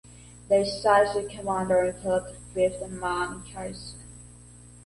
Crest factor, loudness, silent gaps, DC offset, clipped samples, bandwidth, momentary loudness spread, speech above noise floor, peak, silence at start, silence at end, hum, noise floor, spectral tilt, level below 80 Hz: 20 dB; -26 LUFS; none; under 0.1%; under 0.1%; 11.5 kHz; 19 LU; 23 dB; -8 dBFS; 0.05 s; 0.05 s; 60 Hz at -45 dBFS; -49 dBFS; -4.5 dB/octave; -50 dBFS